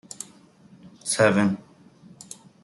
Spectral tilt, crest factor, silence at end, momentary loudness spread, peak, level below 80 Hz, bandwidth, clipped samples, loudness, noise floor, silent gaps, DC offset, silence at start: -4.5 dB/octave; 22 dB; 1.05 s; 23 LU; -4 dBFS; -70 dBFS; 12 kHz; under 0.1%; -23 LUFS; -53 dBFS; none; under 0.1%; 0.2 s